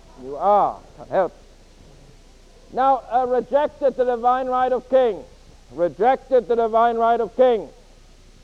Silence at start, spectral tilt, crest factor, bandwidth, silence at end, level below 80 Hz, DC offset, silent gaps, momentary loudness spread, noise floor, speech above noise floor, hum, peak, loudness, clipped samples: 0.2 s; -6 dB/octave; 16 dB; 8 kHz; 0.75 s; -48 dBFS; under 0.1%; none; 9 LU; -48 dBFS; 28 dB; none; -6 dBFS; -20 LUFS; under 0.1%